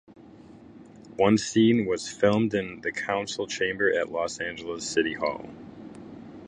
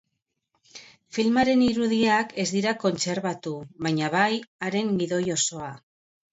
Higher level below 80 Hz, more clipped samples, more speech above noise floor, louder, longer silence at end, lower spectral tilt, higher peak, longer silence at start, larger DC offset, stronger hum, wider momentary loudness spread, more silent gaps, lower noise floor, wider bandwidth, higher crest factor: about the same, -60 dBFS vs -62 dBFS; neither; second, 23 dB vs 56 dB; about the same, -26 LUFS vs -25 LUFS; second, 0 s vs 0.55 s; about the same, -4.5 dB/octave vs -4 dB/octave; about the same, -6 dBFS vs -8 dBFS; second, 0.25 s vs 0.75 s; neither; neither; first, 22 LU vs 10 LU; second, none vs 4.47-4.59 s; second, -49 dBFS vs -80 dBFS; first, 10.5 kHz vs 8 kHz; about the same, 20 dB vs 18 dB